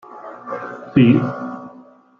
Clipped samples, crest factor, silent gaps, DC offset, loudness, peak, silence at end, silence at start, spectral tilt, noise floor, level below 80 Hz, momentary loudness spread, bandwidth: under 0.1%; 18 dB; none; under 0.1%; -18 LUFS; -2 dBFS; 0.4 s; 0.1 s; -9.5 dB/octave; -45 dBFS; -56 dBFS; 22 LU; 4.7 kHz